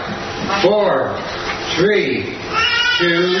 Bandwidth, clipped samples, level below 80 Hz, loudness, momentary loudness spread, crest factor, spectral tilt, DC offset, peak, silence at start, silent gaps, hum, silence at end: 6.4 kHz; under 0.1%; -46 dBFS; -16 LUFS; 9 LU; 16 dB; -4 dB/octave; under 0.1%; -2 dBFS; 0 s; none; none; 0 s